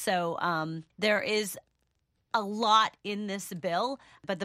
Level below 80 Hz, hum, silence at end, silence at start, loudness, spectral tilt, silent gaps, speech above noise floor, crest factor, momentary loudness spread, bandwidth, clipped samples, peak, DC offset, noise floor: -74 dBFS; none; 0 s; 0 s; -29 LUFS; -3.5 dB/octave; none; 46 dB; 20 dB; 13 LU; 15.5 kHz; under 0.1%; -10 dBFS; under 0.1%; -76 dBFS